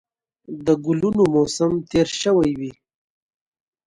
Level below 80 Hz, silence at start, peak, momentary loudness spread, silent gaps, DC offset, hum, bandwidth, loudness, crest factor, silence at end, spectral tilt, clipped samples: -50 dBFS; 0.5 s; -4 dBFS; 11 LU; none; under 0.1%; none; 11.5 kHz; -20 LUFS; 16 dB; 1.15 s; -5.5 dB/octave; under 0.1%